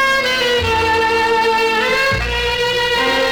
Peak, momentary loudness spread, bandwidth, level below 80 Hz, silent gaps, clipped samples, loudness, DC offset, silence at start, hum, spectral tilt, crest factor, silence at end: -6 dBFS; 2 LU; over 20 kHz; -32 dBFS; none; under 0.1%; -15 LUFS; under 0.1%; 0 s; none; -3 dB/octave; 10 dB; 0 s